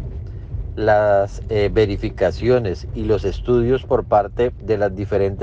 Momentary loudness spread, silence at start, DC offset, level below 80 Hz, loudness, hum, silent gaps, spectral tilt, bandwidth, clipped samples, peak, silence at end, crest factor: 9 LU; 0 s; under 0.1%; -32 dBFS; -19 LUFS; none; none; -8 dB/octave; 7.8 kHz; under 0.1%; -4 dBFS; 0 s; 14 dB